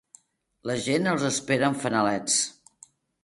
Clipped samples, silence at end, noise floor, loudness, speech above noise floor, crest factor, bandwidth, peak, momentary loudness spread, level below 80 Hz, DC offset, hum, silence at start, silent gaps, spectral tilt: under 0.1%; 0.7 s; -58 dBFS; -25 LUFS; 33 dB; 18 dB; 11.5 kHz; -8 dBFS; 8 LU; -64 dBFS; under 0.1%; none; 0.65 s; none; -3.5 dB/octave